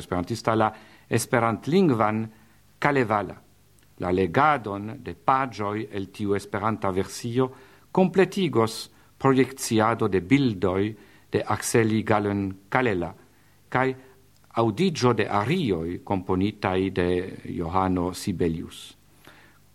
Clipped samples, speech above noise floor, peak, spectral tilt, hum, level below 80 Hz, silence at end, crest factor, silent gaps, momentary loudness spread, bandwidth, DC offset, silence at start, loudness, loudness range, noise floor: under 0.1%; 34 dB; -4 dBFS; -6 dB/octave; 50 Hz at -55 dBFS; -54 dBFS; 0.45 s; 22 dB; none; 10 LU; 15 kHz; under 0.1%; 0 s; -25 LUFS; 3 LU; -58 dBFS